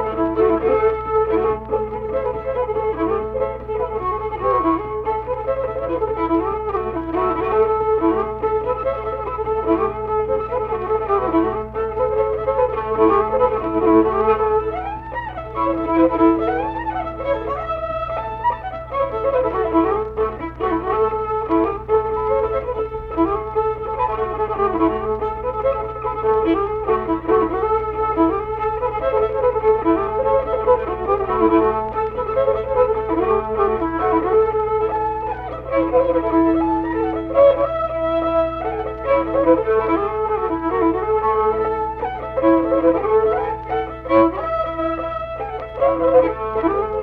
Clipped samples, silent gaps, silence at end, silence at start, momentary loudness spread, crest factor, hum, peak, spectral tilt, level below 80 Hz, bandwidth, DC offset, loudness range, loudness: under 0.1%; none; 0 s; 0 s; 8 LU; 16 dB; none; -2 dBFS; -9.5 dB/octave; -38 dBFS; 4.7 kHz; under 0.1%; 3 LU; -19 LUFS